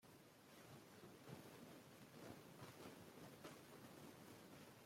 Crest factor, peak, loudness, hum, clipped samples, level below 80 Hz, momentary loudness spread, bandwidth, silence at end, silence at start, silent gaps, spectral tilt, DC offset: 18 dB; -44 dBFS; -61 LUFS; none; under 0.1%; -88 dBFS; 4 LU; 16.5 kHz; 0 s; 0 s; none; -4.5 dB/octave; under 0.1%